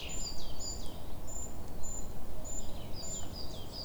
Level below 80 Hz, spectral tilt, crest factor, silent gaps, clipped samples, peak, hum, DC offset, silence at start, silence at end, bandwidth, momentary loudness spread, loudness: -44 dBFS; -3 dB/octave; 10 dB; none; under 0.1%; -20 dBFS; none; under 0.1%; 0 s; 0 s; over 20 kHz; 5 LU; -43 LUFS